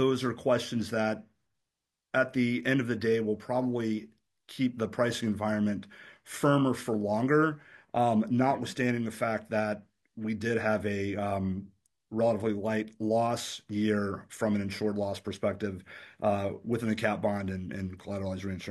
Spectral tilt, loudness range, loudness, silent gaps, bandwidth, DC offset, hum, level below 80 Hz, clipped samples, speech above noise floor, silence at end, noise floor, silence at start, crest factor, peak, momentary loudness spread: -6 dB/octave; 4 LU; -30 LUFS; none; 12.5 kHz; under 0.1%; none; -70 dBFS; under 0.1%; 57 dB; 0 s; -87 dBFS; 0 s; 18 dB; -12 dBFS; 10 LU